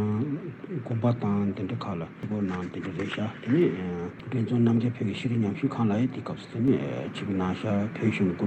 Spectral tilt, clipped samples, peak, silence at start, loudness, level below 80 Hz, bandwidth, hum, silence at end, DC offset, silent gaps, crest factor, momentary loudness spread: -8.5 dB/octave; under 0.1%; -12 dBFS; 0 s; -28 LUFS; -66 dBFS; 8.6 kHz; none; 0 s; under 0.1%; none; 16 dB; 10 LU